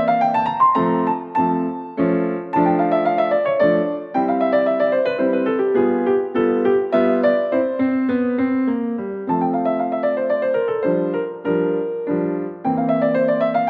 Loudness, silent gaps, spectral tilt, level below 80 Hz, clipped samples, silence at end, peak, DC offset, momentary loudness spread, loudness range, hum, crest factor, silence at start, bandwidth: -19 LUFS; none; -9.5 dB/octave; -60 dBFS; under 0.1%; 0 s; -4 dBFS; under 0.1%; 6 LU; 3 LU; none; 14 dB; 0 s; 5 kHz